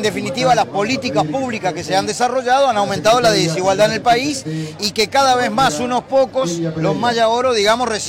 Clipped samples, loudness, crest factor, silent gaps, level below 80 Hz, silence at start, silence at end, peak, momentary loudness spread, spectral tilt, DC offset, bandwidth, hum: under 0.1%; -16 LUFS; 12 dB; none; -50 dBFS; 0 s; 0 s; -4 dBFS; 7 LU; -4 dB/octave; under 0.1%; 16.5 kHz; none